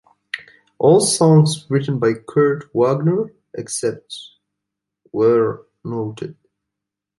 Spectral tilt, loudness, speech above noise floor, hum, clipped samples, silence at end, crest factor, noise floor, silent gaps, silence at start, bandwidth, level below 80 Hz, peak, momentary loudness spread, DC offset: -5.5 dB/octave; -17 LUFS; 66 dB; none; under 0.1%; 0.85 s; 16 dB; -83 dBFS; none; 0.35 s; 11.5 kHz; -62 dBFS; -2 dBFS; 19 LU; under 0.1%